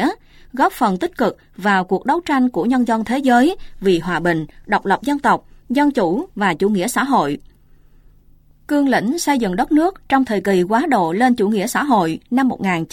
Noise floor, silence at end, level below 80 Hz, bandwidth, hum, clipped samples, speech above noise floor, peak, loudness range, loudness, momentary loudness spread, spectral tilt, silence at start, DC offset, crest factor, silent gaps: -49 dBFS; 0.05 s; -46 dBFS; 17 kHz; none; under 0.1%; 32 dB; -2 dBFS; 3 LU; -17 LUFS; 6 LU; -5.5 dB/octave; 0 s; under 0.1%; 16 dB; none